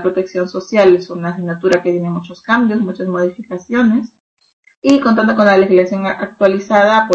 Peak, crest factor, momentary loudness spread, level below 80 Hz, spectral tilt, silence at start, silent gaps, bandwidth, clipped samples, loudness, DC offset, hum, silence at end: 0 dBFS; 14 dB; 10 LU; -54 dBFS; -6.5 dB/octave; 0 s; 4.20-4.37 s, 4.53-4.63 s, 4.76-4.82 s; 8 kHz; under 0.1%; -13 LUFS; under 0.1%; none; 0 s